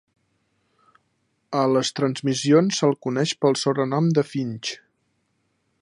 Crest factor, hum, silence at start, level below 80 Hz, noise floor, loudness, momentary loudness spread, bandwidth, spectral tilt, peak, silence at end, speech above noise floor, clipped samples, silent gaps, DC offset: 18 dB; none; 1.5 s; -70 dBFS; -71 dBFS; -22 LUFS; 10 LU; 11.5 kHz; -5.5 dB/octave; -6 dBFS; 1.05 s; 50 dB; under 0.1%; none; under 0.1%